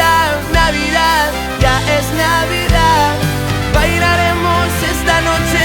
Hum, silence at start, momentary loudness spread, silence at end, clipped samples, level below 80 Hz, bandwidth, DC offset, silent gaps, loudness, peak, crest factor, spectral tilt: none; 0 s; 4 LU; 0 s; under 0.1%; -22 dBFS; 19.5 kHz; under 0.1%; none; -13 LUFS; 0 dBFS; 12 dB; -4 dB/octave